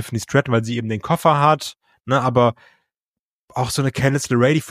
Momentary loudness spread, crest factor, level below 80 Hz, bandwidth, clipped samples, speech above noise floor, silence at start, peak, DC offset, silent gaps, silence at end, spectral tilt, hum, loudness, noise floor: 9 LU; 18 dB; -52 dBFS; 15.5 kHz; under 0.1%; 71 dB; 0 s; -2 dBFS; under 0.1%; 2.97-3.48 s; 0 s; -5.5 dB/octave; none; -19 LUFS; -89 dBFS